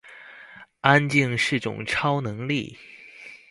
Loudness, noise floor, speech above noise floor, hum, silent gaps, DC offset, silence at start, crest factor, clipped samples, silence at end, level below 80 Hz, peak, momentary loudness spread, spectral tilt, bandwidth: -23 LUFS; -47 dBFS; 24 dB; none; none; under 0.1%; 0.05 s; 26 dB; under 0.1%; 0.15 s; -58 dBFS; 0 dBFS; 25 LU; -5.5 dB/octave; 11.5 kHz